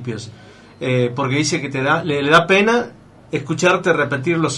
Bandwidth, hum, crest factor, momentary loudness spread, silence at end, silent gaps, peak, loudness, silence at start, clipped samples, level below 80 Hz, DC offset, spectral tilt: 11.5 kHz; none; 16 dB; 14 LU; 0 s; none; -2 dBFS; -17 LUFS; 0 s; under 0.1%; -56 dBFS; under 0.1%; -5 dB/octave